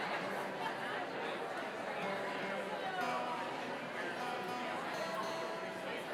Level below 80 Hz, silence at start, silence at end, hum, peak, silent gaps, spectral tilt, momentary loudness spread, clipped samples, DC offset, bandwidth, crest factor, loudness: under -90 dBFS; 0 s; 0 s; none; -26 dBFS; none; -4 dB/octave; 3 LU; under 0.1%; under 0.1%; 16.5 kHz; 14 dB; -40 LUFS